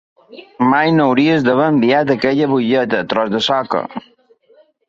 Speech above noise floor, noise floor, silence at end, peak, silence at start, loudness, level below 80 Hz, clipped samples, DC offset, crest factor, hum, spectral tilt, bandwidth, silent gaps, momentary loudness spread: 37 dB; -52 dBFS; 0.9 s; -2 dBFS; 0.3 s; -15 LUFS; -58 dBFS; under 0.1%; under 0.1%; 14 dB; none; -6.5 dB/octave; 7.6 kHz; none; 7 LU